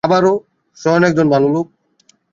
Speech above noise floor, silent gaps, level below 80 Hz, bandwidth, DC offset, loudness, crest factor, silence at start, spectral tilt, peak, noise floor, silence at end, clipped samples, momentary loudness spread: 43 dB; none; -54 dBFS; 7.6 kHz; under 0.1%; -15 LUFS; 14 dB; 0.05 s; -7 dB/octave; -2 dBFS; -56 dBFS; 0.7 s; under 0.1%; 9 LU